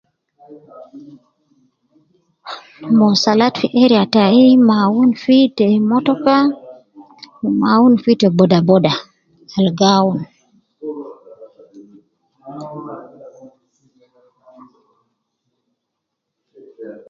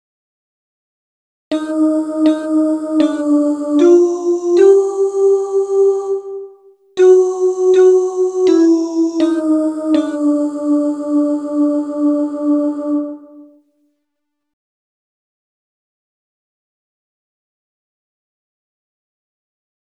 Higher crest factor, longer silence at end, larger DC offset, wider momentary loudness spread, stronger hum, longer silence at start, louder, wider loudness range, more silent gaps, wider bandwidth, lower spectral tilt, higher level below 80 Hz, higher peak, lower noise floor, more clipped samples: about the same, 16 dB vs 16 dB; second, 0.15 s vs 6.45 s; neither; first, 21 LU vs 10 LU; neither; second, 0.5 s vs 1.5 s; about the same, -13 LUFS vs -14 LUFS; first, 13 LU vs 7 LU; neither; second, 7 kHz vs 9.6 kHz; first, -6.5 dB/octave vs -4.5 dB/octave; first, -60 dBFS vs -70 dBFS; about the same, 0 dBFS vs 0 dBFS; about the same, -77 dBFS vs -76 dBFS; neither